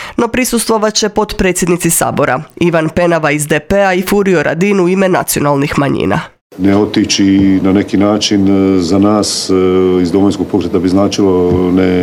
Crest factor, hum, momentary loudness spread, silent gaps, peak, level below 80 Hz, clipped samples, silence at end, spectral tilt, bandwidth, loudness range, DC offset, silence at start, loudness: 10 dB; none; 4 LU; 6.41-6.50 s; 0 dBFS; -36 dBFS; under 0.1%; 0 s; -5 dB/octave; 19 kHz; 2 LU; under 0.1%; 0 s; -11 LUFS